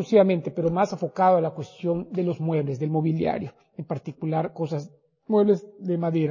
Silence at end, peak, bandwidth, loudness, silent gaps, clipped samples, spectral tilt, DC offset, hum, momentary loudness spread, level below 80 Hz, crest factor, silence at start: 0 s; -6 dBFS; 7.4 kHz; -25 LUFS; none; under 0.1%; -8.5 dB/octave; under 0.1%; none; 13 LU; -60 dBFS; 18 dB; 0 s